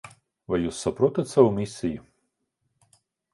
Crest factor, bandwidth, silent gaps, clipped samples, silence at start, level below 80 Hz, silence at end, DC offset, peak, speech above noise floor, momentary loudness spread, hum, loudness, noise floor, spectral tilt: 24 dB; 11.5 kHz; none; under 0.1%; 0.05 s; -54 dBFS; 1.35 s; under 0.1%; -4 dBFS; 53 dB; 11 LU; none; -24 LUFS; -77 dBFS; -6.5 dB/octave